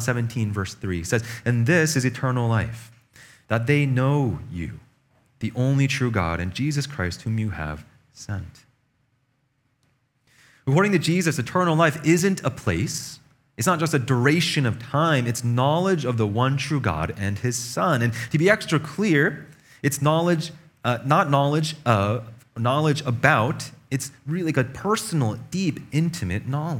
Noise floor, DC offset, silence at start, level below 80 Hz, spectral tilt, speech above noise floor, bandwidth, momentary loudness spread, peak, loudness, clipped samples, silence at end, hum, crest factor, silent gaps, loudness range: -69 dBFS; under 0.1%; 0 s; -50 dBFS; -5.5 dB/octave; 47 dB; 17 kHz; 11 LU; 0 dBFS; -23 LUFS; under 0.1%; 0 s; none; 24 dB; none; 5 LU